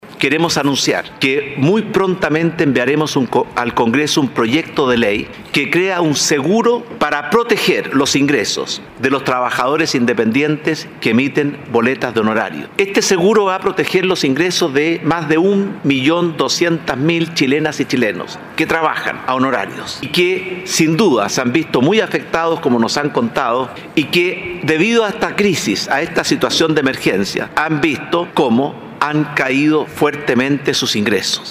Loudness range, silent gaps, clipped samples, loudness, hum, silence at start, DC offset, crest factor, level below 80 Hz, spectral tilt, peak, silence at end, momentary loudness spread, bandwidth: 1 LU; none; under 0.1%; -15 LUFS; none; 0.05 s; under 0.1%; 14 dB; -52 dBFS; -4 dB/octave; -2 dBFS; 0 s; 5 LU; 16 kHz